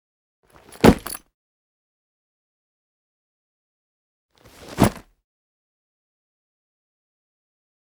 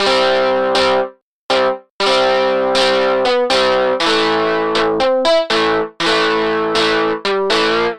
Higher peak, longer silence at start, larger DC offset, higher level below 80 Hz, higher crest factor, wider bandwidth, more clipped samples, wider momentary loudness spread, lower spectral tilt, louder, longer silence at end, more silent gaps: about the same, 0 dBFS vs -2 dBFS; first, 0.85 s vs 0 s; neither; about the same, -42 dBFS vs -46 dBFS; first, 28 dB vs 14 dB; first, over 20 kHz vs 10.5 kHz; neither; first, 19 LU vs 4 LU; first, -6 dB/octave vs -3 dB/octave; second, -19 LUFS vs -14 LUFS; first, 2.95 s vs 0 s; first, 1.34-4.29 s vs 1.22-1.49 s, 1.90-1.99 s